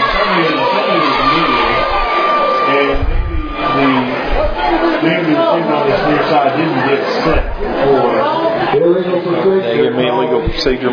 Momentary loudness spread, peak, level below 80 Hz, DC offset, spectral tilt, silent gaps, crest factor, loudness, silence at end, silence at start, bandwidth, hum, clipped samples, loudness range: 4 LU; 0 dBFS; -24 dBFS; under 0.1%; -6.5 dB/octave; none; 12 dB; -13 LUFS; 0 s; 0 s; 5.4 kHz; none; under 0.1%; 1 LU